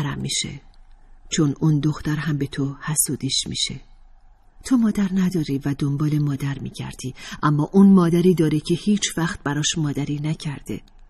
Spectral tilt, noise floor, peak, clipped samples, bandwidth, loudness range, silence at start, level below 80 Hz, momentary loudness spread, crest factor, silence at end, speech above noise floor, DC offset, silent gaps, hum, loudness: -5 dB/octave; -49 dBFS; -4 dBFS; under 0.1%; 13.5 kHz; 4 LU; 0 s; -46 dBFS; 14 LU; 18 dB; 0.3 s; 28 dB; under 0.1%; none; none; -21 LUFS